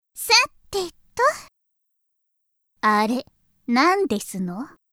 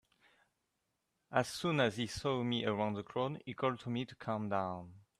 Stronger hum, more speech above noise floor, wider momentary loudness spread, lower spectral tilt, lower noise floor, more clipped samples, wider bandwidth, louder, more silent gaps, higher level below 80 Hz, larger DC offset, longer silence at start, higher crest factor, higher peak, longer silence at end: neither; first, 53 dB vs 48 dB; first, 15 LU vs 7 LU; second, -2.5 dB/octave vs -5.5 dB/octave; second, -74 dBFS vs -84 dBFS; neither; first, 16.5 kHz vs 14 kHz; first, -21 LUFS vs -37 LUFS; neither; first, -60 dBFS vs -68 dBFS; neither; second, 0.15 s vs 1.3 s; about the same, 20 dB vs 22 dB; first, -2 dBFS vs -16 dBFS; about the same, 0.25 s vs 0.2 s